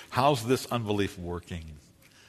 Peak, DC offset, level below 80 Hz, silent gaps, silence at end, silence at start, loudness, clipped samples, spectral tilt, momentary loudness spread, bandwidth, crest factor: -10 dBFS; under 0.1%; -54 dBFS; none; 0.5 s; 0 s; -29 LUFS; under 0.1%; -5.5 dB/octave; 16 LU; 13.5 kHz; 20 dB